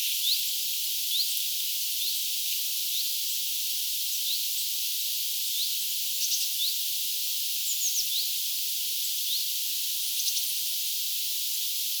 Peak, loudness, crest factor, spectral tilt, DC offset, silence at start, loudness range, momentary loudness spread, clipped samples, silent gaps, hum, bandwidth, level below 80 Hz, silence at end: -10 dBFS; -26 LUFS; 18 dB; 13.5 dB/octave; under 0.1%; 0 s; 1 LU; 2 LU; under 0.1%; none; none; over 20 kHz; under -90 dBFS; 0 s